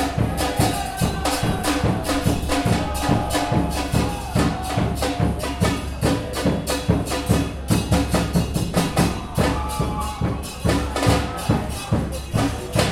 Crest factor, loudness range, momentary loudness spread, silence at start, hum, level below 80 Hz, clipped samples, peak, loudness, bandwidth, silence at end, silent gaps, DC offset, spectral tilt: 18 dB; 1 LU; 4 LU; 0 s; none; -30 dBFS; under 0.1%; -4 dBFS; -22 LUFS; 16.5 kHz; 0 s; none; under 0.1%; -5.5 dB/octave